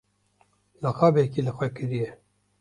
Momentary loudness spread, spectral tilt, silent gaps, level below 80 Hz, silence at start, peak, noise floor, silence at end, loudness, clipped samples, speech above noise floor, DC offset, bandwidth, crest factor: 11 LU; -8.5 dB/octave; none; -60 dBFS; 0.8 s; -6 dBFS; -66 dBFS; 0.45 s; -25 LUFS; under 0.1%; 42 dB; under 0.1%; 10.5 kHz; 22 dB